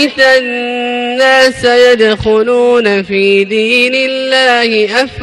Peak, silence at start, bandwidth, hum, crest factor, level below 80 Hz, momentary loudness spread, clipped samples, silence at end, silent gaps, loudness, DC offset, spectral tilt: 0 dBFS; 0 s; 12.5 kHz; none; 10 dB; -42 dBFS; 6 LU; 0.2%; 0 s; none; -9 LUFS; under 0.1%; -3.5 dB/octave